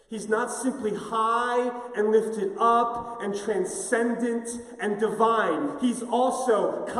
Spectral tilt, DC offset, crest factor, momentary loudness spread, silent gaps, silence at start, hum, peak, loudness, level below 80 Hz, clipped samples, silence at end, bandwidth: -4 dB/octave; under 0.1%; 18 dB; 8 LU; none; 0.1 s; none; -8 dBFS; -26 LUFS; -66 dBFS; under 0.1%; 0 s; 14 kHz